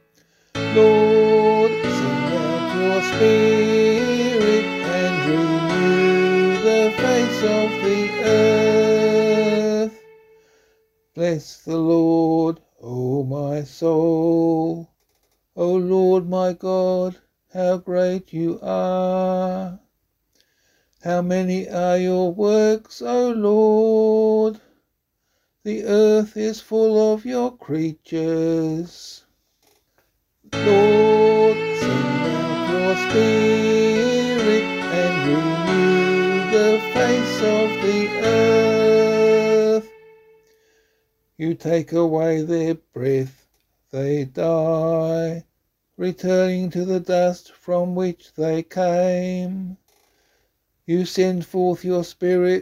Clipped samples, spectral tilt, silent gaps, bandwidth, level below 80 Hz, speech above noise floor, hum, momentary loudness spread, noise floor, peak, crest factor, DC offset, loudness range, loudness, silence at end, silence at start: under 0.1%; -6 dB/octave; none; 13.5 kHz; -58 dBFS; 54 dB; none; 10 LU; -73 dBFS; -4 dBFS; 16 dB; under 0.1%; 6 LU; -19 LUFS; 0 s; 0.55 s